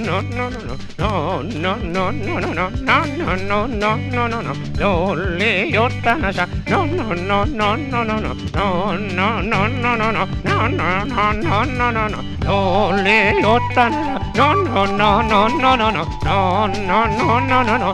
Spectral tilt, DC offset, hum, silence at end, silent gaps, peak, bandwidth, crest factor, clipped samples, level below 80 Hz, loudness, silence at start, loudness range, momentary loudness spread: -6 dB/octave; under 0.1%; none; 0 s; none; 0 dBFS; 11 kHz; 18 dB; under 0.1%; -32 dBFS; -17 LUFS; 0 s; 4 LU; 7 LU